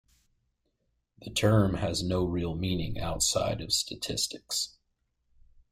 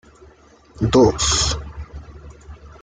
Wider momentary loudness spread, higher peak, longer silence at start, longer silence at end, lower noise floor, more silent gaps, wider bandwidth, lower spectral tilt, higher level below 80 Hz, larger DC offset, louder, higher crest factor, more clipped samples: second, 8 LU vs 22 LU; second, -12 dBFS vs -4 dBFS; first, 1.2 s vs 0.75 s; first, 1.05 s vs 0.15 s; first, -77 dBFS vs -49 dBFS; neither; first, 16 kHz vs 9.8 kHz; about the same, -4 dB/octave vs -4 dB/octave; second, -48 dBFS vs -34 dBFS; neither; second, -29 LUFS vs -17 LUFS; about the same, 20 dB vs 18 dB; neither